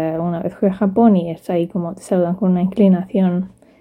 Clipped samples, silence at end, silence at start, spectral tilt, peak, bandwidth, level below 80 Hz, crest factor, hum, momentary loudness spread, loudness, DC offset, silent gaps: under 0.1%; 0.35 s; 0 s; -9 dB/octave; 0 dBFS; 10.5 kHz; -54 dBFS; 16 dB; none; 9 LU; -17 LUFS; under 0.1%; none